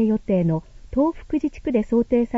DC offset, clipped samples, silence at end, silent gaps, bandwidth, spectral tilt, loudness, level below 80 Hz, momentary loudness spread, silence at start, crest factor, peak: under 0.1%; under 0.1%; 0 s; none; 7.6 kHz; -10 dB/octave; -22 LUFS; -42 dBFS; 6 LU; 0 s; 14 dB; -8 dBFS